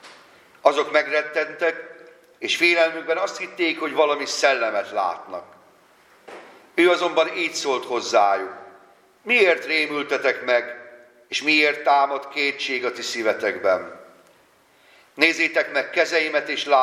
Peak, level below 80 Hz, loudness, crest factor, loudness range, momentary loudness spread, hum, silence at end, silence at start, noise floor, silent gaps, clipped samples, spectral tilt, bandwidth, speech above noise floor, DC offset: 0 dBFS; -78 dBFS; -21 LUFS; 22 dB; 3 LU; 11 LU; none; 0 s; 0.05 s; -57 dBFS; none; under 0.1%; -2 dB/octave; 14.5 kHz; 36 dB; under 0.1%